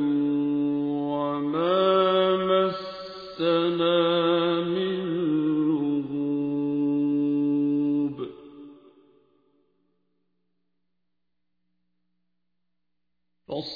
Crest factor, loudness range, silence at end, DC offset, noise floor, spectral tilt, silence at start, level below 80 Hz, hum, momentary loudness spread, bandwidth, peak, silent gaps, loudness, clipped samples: 16 dB; 8 LU; 0 s; under 0.1%; -83 dBFS; -8.5 dB/octave; 0 s; -68 dBFS; 60 Hz at -65 dBFS; 11 LU; 5 kHz; -10 dBFS; none; -24 LUFS; under 0.1%